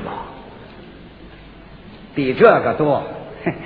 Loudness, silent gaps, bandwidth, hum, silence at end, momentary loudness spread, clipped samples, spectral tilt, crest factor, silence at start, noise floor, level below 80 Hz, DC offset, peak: -17 LUFS; none; 5 kHz; none; 0 s; 27 LU; under 0.1%; -10 dB/octave; 20 dB; 0 s; -40 dBFS; -48 dBFS; under 0.1%; 0 dBFS